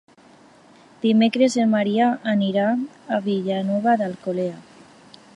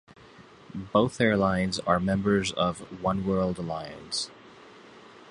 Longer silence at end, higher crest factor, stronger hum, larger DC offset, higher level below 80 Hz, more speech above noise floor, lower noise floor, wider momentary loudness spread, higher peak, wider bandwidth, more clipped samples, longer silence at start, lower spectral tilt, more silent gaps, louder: first, 0.75 s vs 0 s; about the same, 16 dB vs 20 dB; neither; neither; second, -72 dBFS vs -52 dBFS; first, 30 dB vs 25 dB; about the same, -51 dBFS vs -51 dBFS; second, 8 LU vs 11 LU; about the same, -6 dBFS vs -8 dBFS; about the same, 10.5 kHz vs 11 kHz; neither; first, 1.05 s vs 0.4 s; about the same, -6 dB/octave vs -5.5 dB/octave; neither; first, -21 LUFS vs -27 LUFS